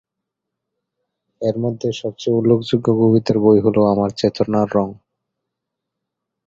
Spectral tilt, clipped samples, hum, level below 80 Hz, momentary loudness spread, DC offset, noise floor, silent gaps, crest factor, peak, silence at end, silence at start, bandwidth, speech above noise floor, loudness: -8 dB/octave; under 0.1%; none; -52 dBFS; 10 LU; under 0.1%; -81 dBFS; none; 18 dB; 0 dBFS; 1.55 s; 1.4 s; 7.8 kHz; 65 dB; -17 LUFS